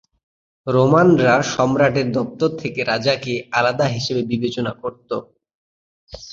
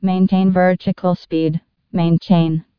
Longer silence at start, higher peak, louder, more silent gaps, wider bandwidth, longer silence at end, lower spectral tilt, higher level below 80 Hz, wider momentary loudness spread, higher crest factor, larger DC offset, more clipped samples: first, 0.65 s vs 0 s; about the same, -2 dBFS vs -2 dBFS; about the same, -18 LUFS vs -17 LUFS; first, 5.55-6.07 s vs none; first, 7.8 kHz vs 5.4 kHz; second, 0 s vs 0.15 s; second, -6 dB/octave vs -10 dB/octave; about the same, -52 dBFS vs -54 dBFS; first, 15 LU vs 7 LU; about the same, 18 dB vs 14 dB; neither; neither